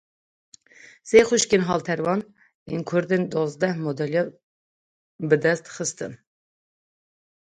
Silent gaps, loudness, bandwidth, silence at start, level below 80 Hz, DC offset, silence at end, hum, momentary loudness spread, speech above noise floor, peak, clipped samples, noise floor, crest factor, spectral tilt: 2.54-2.66 s, 4.43-5.19 s; -23 LUFS; 10.5 kHz; 1.05 s; -62 dBFS; under 0.1%; 1.4 s; none; 14 LU; 29 dB; -2 dBFS; under 0.1%; -51 dBFS; 24 dB; -4.5 dB/octave